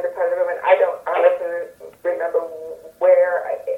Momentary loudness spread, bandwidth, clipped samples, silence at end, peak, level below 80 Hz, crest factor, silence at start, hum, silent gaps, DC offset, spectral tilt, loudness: 15 LU; 3.9 kHz; under 0.1%; 0 s; -2 dBFS; -68 dBFS; 18 dB; 0 s; none; none; under 0.1%; -4 dB/octave; -19 LUFS